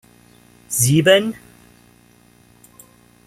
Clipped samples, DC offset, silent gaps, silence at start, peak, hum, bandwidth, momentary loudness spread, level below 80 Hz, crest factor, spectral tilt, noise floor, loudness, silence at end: under 0.1%; under 0.1%; none; 0.7 s; -2 dBFS; 60 Hz at -50 dBFS; 15.5 kHz; 16 LU; -56 dBFS; 20 dB; -4 dB/octave; -52 dBFS; -16 LUFS; 1.95 s